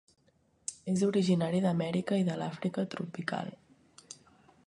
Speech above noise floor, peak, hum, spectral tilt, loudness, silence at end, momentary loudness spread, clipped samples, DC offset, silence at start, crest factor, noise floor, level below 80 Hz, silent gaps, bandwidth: 39 dB; -14 dBFS; none; -6 dB/octave; -32 LUFS; 0.5 s; 19 LU; under 0.1%; under 0.1%; 0.7 s; 18 dB; -69 dBFS; -72 dBFS; none; 11 kHz